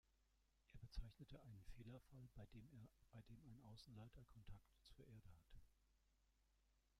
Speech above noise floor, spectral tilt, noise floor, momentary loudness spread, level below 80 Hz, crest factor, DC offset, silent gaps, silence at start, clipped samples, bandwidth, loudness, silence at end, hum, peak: 19 dB; -6.5 dB/octave; -83 dBFS; 7 LU; -66 dBFS; 22 dB; under 0.1%; none; 0.05 s; under 0.1%; 14.5 kHz; -64 LUFS; 0 s; none; -40 dBFS